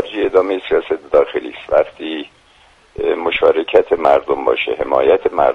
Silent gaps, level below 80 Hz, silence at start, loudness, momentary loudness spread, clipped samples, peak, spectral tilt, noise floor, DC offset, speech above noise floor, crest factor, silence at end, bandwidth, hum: none; -46 dBFS; 0 s; -16 LUFS; 11 LU; under 0.1%; 0 dBFS; -6 dB/octave; -49 dBFS; under 0.1%; 34 dB; 16 dB; 0 s; 6.4 kHz; none